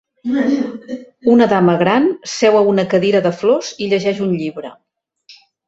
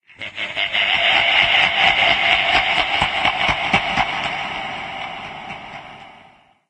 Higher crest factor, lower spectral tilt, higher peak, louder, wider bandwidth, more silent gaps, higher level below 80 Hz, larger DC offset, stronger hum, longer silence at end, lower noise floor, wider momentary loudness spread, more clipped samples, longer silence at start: second, 14 dB vs 20 dB; first, -6 dB/octave vs -2.5 dB/octave; about the same, -2 dBFS vs 0 dBFS; about the same, -15 LUFS vs -16 LUFS; second, 8 kHz vs 10.5 kHz; neither; second, -58 dBFS vs -44 dBFS; neither; neither; second, 0.35 s vs 0.55 s; about the same, -48 dBFS vs -50 dBFS; second, 13 LU vs 18 LU; neither; about the same, 0.25 s vs 0.2 s